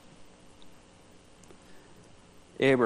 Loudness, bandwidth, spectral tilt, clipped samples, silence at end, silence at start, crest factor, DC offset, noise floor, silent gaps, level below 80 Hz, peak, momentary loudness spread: -27 LUFS; 11.5 kHz; -6 dB/octave; under 0.1%; 0 s; 0.2 s; 22 dB; under 0.1%; -55 dBFS; none; -64 dBFS; -12 dBFS; 23 LU